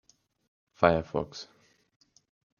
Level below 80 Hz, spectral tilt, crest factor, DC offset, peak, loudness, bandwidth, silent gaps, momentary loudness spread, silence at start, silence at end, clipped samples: -58 dBFS; -6.5 dB/octave; 28 dB; under 0.1%; -6 dBFS; -28 LUFS; 7.2 kHz; none; 20 LU; 0.8 s; 1.15 s; under 0.1%